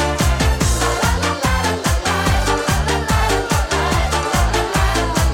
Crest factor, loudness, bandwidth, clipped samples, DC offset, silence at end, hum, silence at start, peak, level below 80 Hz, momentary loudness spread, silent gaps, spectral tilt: 12 dB; -17 LUFS; 17.5 kHz; under 0.1%; under 0.1%; 0 s; none; 0 s; -4 dBFS; -22 dBFS; 1 LU; none; -4 dB/octave